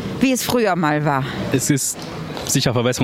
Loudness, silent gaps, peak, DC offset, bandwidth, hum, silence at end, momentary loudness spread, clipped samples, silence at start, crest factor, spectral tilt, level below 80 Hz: -19 LUFS; none; -4 dBFS; under 0.1%; 16.5 kHz; none; 0 s; 7 LU; under 0.1%; 0 s; 16 dB; -4.5 dB/octave; -46 dBFS